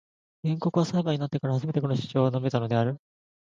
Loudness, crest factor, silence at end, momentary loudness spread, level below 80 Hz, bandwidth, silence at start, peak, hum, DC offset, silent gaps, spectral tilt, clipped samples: -27 LUFS; 16 dB; 0.45 s; 5 LU; -64 dBFS; 7.6 kHz; 0.45 s; -10 dBFS; none; under 0.1%; none; -8 dB/octave; under 0.1%